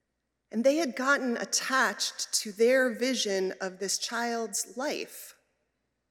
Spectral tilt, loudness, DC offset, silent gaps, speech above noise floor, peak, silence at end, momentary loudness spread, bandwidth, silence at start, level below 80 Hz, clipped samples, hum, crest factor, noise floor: -1.5 dB/octave; -28 LUFS; under 0.1%; none; 52 dB; -12 dBFS; 0.8 s; 10 LU; 17 kHz; 0.55 s; -86 dBFS; under 0.1%; none; 18 dB; -81 dBFS